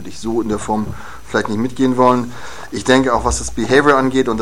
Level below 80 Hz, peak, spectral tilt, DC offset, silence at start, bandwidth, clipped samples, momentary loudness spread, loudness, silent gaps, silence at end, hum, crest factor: -34 dBFS; 0 dBFS; -5 dB/octave; 3%; 0 s; 15 kHz; under 0.1%; 15 LU; -16 LUFS; none; 0 s; none; 16 dB